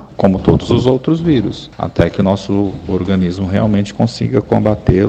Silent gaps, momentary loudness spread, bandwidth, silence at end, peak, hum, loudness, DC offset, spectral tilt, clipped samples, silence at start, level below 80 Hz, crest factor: none; 5 LU; 8.4 kHz; 0 s; 0 dBFS; none; -15 LUFS; under 0.1%; -8 dB/octave; 0.2%; 0 s; -32 dBFS; 14 dB